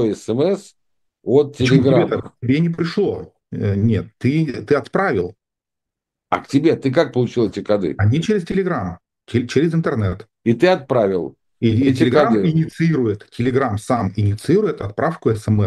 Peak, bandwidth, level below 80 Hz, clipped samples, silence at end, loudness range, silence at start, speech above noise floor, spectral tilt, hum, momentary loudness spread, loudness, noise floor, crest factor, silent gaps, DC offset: 0 dBFS; 12 kHz; -50 dBFS; under 0.1%; 0 s; 3 LU; 0 s; 67 dB; -7.5 dB/octave; none; 8 LU; -18 LUFS; -84 dBFS; 18 dB; none; under 0.1%